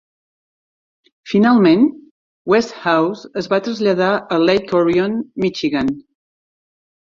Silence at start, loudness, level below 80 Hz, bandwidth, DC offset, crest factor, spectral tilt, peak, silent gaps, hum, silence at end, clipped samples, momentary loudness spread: 1.25 s; -16 LUFS; -54 dBFS; 7.6 kHz; under 0.1%; 18 dB; -6.5 dB/octave; 0 dBFS; 2.11-2.45 s; none; 1.2 s; under 0.1%; 9 LU